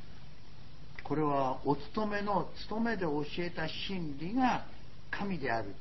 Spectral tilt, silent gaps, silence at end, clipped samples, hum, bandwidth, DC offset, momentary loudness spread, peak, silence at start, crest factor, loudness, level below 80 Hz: -4.5 dB/octave; none; 0 s; under 0.1%; none; 6 kHz; 1%; 22 LU; -18 dBFS; 0 s; 18 dB; -35 LUFS; -56 dBFS